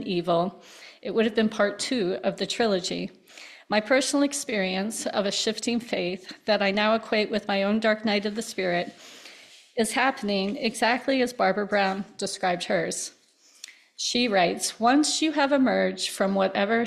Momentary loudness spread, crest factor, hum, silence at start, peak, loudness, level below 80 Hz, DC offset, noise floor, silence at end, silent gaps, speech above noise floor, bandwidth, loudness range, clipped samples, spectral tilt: 14 LU; 18 dB; none; 0 s; -8 dBFS; -25 LUFS; -66 dBFS; under 0.1%; -50 dBFS; 0 s; none; 24 dB; 14 kHz; 3 LU; under 0.1%; -3.5 dB/octave